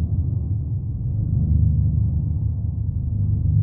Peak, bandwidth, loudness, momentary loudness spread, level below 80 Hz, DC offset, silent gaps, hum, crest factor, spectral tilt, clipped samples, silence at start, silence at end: -8 dBFS; 1.1 kHz; -23 LUFS; 6 LU; -26 dBFS; under 0.1%; none; none; 14 dB; -16.5 dB/octave; under 0.1%; 0 s; 0 s